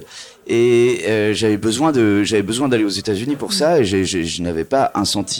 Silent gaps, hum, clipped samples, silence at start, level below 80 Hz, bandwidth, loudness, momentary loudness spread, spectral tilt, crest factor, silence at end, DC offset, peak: none; none; under 0.1%; 0 s; -48 dBFS; 19 kHz; -17 LUFS; 6 LU; -4.5 dB/octave; 14 dB; 0 s; under 0.1%; -4 dBFS